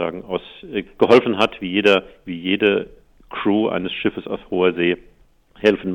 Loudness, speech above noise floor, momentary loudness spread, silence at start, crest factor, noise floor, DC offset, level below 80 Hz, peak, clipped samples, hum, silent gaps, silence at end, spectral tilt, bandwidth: -19 LUFS; 34 dB; 14 LU; 0 s; 18 dB; -53 dBFS; under 0.1%; -52 dBFS; -2 dBFS; under 0.1%; none; none; 0 s; -6 dB/octave; 9.8 kHz